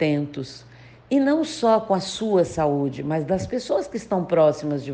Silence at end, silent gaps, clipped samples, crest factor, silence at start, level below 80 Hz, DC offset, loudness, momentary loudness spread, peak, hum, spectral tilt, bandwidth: 0 s; none; under 0.1%; 16 dB; 0 s; -54 dBFS; under 0.1%; -22 LUFS; 8 LU; -6 dBFS; none; -6 dB/octave; 9.6 kHz